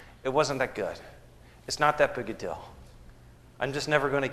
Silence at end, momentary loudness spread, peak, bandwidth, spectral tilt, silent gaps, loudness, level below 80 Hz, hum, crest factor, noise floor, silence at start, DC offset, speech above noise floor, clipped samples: 0 s; 17 LU; -6 dBFS; 13 kHz; -4 dB/octave; none; -28 LUFS; -54 dBFS; none; 24 dB; -53 dBFS; 0 s; under 0.1%; 24 dB; under 0.1%